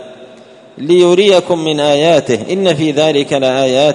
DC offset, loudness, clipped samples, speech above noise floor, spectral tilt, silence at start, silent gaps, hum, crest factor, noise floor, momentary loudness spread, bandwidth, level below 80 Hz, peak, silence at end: under 0.1%; -11 LUFS; under 0.1%; 27 dB; -5 dB/octave; 0 s; none; none; 12 dB; -38 dBFS; 5 LU; 11 kHz; -54 dBFS; 0 dBFS; 0 s